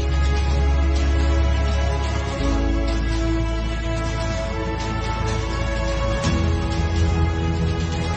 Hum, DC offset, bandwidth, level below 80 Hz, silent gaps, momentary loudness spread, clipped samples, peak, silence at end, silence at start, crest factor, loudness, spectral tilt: none; under 0.1%; 8.6 kHz; -22 dBFS; none; 5 LU; under 0.1%; -8 dBFS; 0 s; 0 s; 12 dB; -22 LUFS; -6 dB/octave